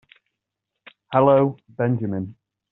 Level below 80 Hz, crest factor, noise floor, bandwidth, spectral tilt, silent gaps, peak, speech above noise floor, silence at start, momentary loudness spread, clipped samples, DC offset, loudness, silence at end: -66 dBFS; 20 dB; -83 dBFS; 4.1 kHz; -7.5 dB/octave; none; -4 dBFS; 63 dB; 1.1 s; 13 LU; under 0.1%; under 0.1%; -21 LUFS; 0.4 s